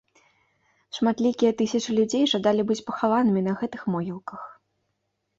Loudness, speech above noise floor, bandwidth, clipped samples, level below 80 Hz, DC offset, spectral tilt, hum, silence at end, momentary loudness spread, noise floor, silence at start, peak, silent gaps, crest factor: -24 LUFS; 53 dB; 7.8 kHz; under 0.1%; -66 dBFS; under 0.1%; -5.5 dB/octave; none; 0.85 s; 15 LU; -77 dBFS; 0.95 s; -10 dBFS; none; 16 dB